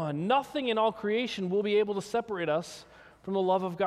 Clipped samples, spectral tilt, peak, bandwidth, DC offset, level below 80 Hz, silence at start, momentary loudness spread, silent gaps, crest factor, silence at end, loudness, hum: under 0.1%; -5.5 dB/octave; -14 dBFS; 13.5 kHz; under 0.1%; -68 dBFS; 0 s; 6 LU; none; 16 dB; 0 s; -29 LUFS; none